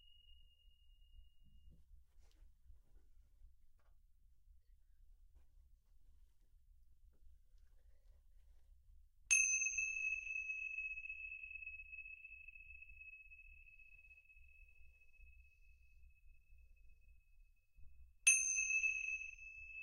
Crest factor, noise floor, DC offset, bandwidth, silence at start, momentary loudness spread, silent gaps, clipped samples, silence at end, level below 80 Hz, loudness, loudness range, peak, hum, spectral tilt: 30 dB; -67 dBFS; under 0.1%; 15.5 kHz; 0.1 s; 24 LU; none; under 0.1%; 0 s; -66 dBFS; -37 LUFS; 20 LU; -16 dBFS; none; 3 dB/octave